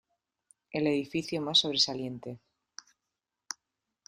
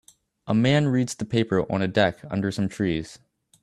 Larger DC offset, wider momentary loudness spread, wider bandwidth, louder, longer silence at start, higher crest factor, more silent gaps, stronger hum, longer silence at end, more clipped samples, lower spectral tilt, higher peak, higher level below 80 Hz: neither; first, 25 LU vs 7 LU; first, 14 kHz vs 12.5 kHz; second, -28 LUFS vs -24 LUFS; first, 0.75 s vs 0.45 s; about the same, 24 dB vs 20 dB; neither; neither; about the same, 0.55 s vs 0.45 s; neither; second, -3.5 dB/octave vs -6 dB/octave; second, -10 dBFS vs -6 dBFS; second, -72 dBFS vs -54 dBFS